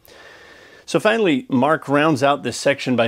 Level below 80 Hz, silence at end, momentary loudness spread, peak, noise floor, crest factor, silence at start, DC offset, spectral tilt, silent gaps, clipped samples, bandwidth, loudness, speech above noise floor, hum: -64 dBFS; 0 s; 4 LU; -2 dBFS; -45 dBFS; 16 dB; 0.25 s; under 0.1%; -5 dB/octave; none; under 0.1%; 16 kHz; -18 LUFS; 28 dB; none